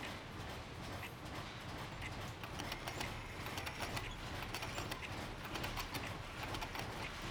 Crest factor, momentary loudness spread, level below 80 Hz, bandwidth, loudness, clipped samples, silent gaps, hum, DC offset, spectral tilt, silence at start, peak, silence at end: 18 dB; 5 LU; -56 dBFS; over 20 kHz; -45 LUFS; under 0.1%; none; none; under 0.1%; -4 dB/octave; 0 s; -28 dBFS; 0 s